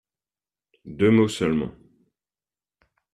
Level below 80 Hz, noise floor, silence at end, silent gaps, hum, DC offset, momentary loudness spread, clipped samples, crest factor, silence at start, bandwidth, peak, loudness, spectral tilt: -56 dBFS; under -90 dBFS; 1.45 s; none; none; under 0.1%; 16 LU; under 0.1%; 20 dB; 0.85 s; 12.5 kHz; -6 dBFS; -21 LUFS; -6.5 dB/octave